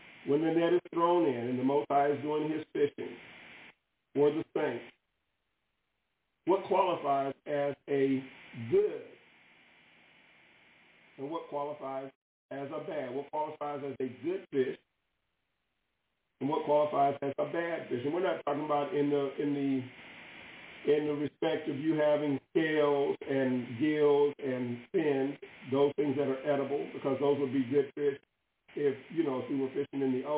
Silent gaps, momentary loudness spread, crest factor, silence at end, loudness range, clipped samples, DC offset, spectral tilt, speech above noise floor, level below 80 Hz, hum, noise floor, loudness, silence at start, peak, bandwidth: 12.15-12.49 s; 14 LU; 16 dB; 0 s; 8 LU; under 0.1%; under 0.1%; -5.5 dB/octave; 51 dB; -78 dBFS; none; -82 dBFS; -32 LUFS; 0 s; -16 dBFS; 4 kHz